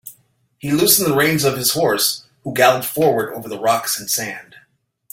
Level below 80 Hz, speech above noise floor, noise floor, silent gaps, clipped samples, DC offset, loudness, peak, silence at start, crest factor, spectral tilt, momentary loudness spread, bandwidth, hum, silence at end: -58 dBFS; 43 dB; -60 dBFS; none; under 0.1%; under 0.1%; -17 LUFS; 0 dBFS; 0.05 s; 18 dB; -3 dB/octave; 13 LU; 17 kHz; none; 0.7 s